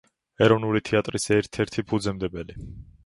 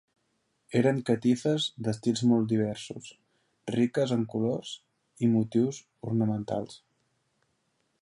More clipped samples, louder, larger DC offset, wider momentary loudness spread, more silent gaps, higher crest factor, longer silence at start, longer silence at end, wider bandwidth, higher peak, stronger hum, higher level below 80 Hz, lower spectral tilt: neither; first, -24 LUFS vs -28 LUFS; neither; about the same, 17 LU vs 16 LU; neither; about the same, 20 dB vs 18 dB; second, 0.4 s vs 0.7 s; second, 0.25 s vs 1.25 s; about the same, 11.5 kHz vs 11 kHz; first, -4 dBFS vs -12 dBFS; neither; first, -48 dBFS vs -68 dBFS; about the same, -5.5 dB/octave vs -6.5 dB/octave